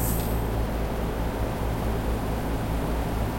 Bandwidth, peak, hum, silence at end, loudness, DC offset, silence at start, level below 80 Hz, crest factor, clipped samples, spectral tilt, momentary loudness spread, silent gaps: 16 kHz; -14 dBFS; none; 0 s; -29 LUFS; under 0.1%; 0 s; -30 dBFS; 12 dB; under 0.1%; -6 dB/octave; 2 LU; none